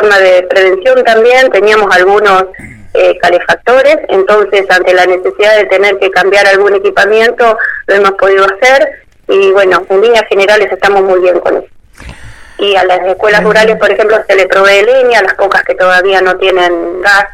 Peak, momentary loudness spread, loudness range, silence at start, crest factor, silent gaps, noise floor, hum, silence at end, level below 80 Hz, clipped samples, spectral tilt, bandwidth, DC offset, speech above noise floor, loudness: 0 dBFS; 4 LU; 2 LU; 0 s; 6 dB; none; -29 dBFS; none; 0 s; -40 dBFS; 0.5%; -3.5 dB/octave; 15 kHz; under 0.1%; 23 dB; -7 LUFS